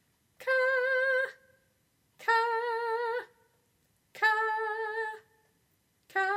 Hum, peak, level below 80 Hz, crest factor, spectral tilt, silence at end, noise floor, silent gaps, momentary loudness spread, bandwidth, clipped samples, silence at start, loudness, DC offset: none; -14 dBFS; -84 dBFS; 18 dB; -1.5 dB/octave; 0 s; -72 dBFS; none; 10 LU; 16 kHz; under 0.1%; 0.4 s; -30 LUFS; under 0.1%